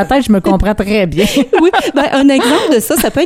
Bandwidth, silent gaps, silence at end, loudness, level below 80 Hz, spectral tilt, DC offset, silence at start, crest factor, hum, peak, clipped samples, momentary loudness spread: 16 kHz; none; 0 s; -11 LUFS; -26 dBFS; -4.5 dB/octave; under 0.1%; 0 s; 10 dB; none; 0 dBFS; under 0.1%; 4 LU